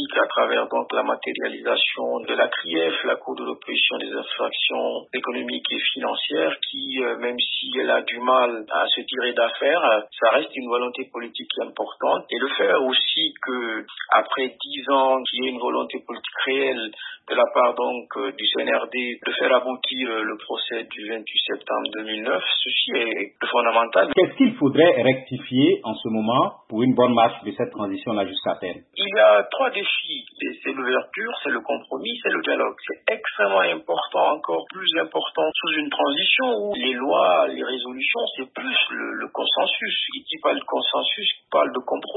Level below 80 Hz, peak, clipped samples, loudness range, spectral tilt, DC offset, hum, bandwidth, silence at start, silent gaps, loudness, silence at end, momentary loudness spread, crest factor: -74 dBFS; -4 dBFS; under 0.1%; 4 LU; -8.5 dB/octave; under 0.1%; none; 4.1 kHz; 0 s; none; -22 LUFS; 0 s; 10 LU; 20 dB